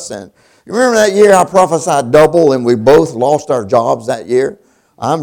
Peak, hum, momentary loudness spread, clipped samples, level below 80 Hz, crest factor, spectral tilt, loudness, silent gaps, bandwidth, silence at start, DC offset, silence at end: 0 dBFS; none; 11 LU; 0.6%; -46 dBFS; 10 dB; -5 dB/octave; -11 LUFS; none; 18.5 kHz; 0 s; under 0.1%; 0 s